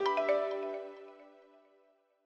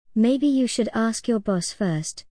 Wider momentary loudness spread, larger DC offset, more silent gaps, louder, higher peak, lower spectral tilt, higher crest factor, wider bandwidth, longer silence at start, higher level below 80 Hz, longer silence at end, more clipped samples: first, 23 LU vs 6 LU; second, under 0.1% vs 0.3%; neither; second, -34 LUFS vs -23 LUFS; second, -18 dBFS vs -10 dBFS; second, -3.5 dB/octave vs -5 dB/octave; about the same, 18 dB vs 14 dB; second, 7.8 kHz vs 10.5 kHz; second, 0 s vs 0.15 s; second, -88 dBFS vs -58 dBFS; first, 0.95 s vs 0.1 s; neither